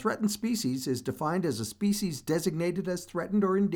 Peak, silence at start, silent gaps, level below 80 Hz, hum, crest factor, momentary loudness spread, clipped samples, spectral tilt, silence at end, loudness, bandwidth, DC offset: -14 dBFS; 0 s; none; -62 dBFS; none; 14 dB; 5 LU; under 0.1%; -5.5 dB/octave; 0 s; -30 LUFS; 19.5 kHz; under 0.1%